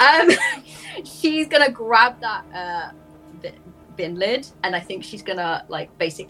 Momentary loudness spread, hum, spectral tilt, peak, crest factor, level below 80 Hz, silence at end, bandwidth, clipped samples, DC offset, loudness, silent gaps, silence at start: 20 LU; none; -3 dB/octave; 0 dBFS; 20 dB; -60 dBFS; 0.05 s; 15.5 kHz; under 0.1%; under 0.1%; -20 LUFS; none; 0 s